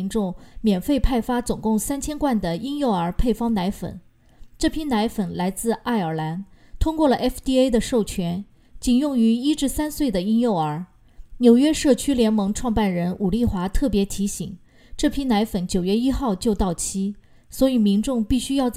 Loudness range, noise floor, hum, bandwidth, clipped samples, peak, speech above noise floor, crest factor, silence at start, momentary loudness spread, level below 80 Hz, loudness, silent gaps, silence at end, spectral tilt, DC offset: 4 LU; -46 dBFS; none; 15.5 kHz; under 0.1%; -4 dBFS; 25 dB; 18 dB; 0 s; 8 LU; -34 dBFS; -22 LUFS; none; 0 s; -5.5 dB/octave; under 0.1%